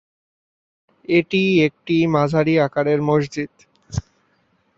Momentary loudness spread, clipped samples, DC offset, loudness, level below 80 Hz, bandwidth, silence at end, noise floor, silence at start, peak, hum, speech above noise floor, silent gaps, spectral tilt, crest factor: 13 LU; under 0.1%; under 0.1%; -18 LUFS; -48 dBFS; 7.8 kHz; 0.8 s; -63 dBFS; 1.1 s; -4 dBFS; none; 45 dB; none; -7 dB/octave; 18 dB